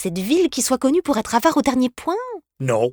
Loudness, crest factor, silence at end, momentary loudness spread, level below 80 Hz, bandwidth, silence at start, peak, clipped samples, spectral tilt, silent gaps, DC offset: -20 LUFS; 16 dB; 0 s; 9 LU; -52 dBFS; over 20 kHz; 0 s; -2 dBFS; under 0.1%; -4.5 dB/octave; none; under 0.1%